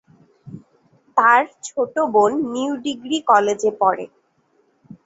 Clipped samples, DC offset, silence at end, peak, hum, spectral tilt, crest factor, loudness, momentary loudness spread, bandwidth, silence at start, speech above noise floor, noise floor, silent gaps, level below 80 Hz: under 0.1%; under 0.1%; 0.1 s; -2 dBFS; none; -3.5 dB/octave; 18 dB; -19 LUFS; 11 LU; 8 kHz; 0.45 s; 44 dB; -62 dBFS; none; -66 dBFS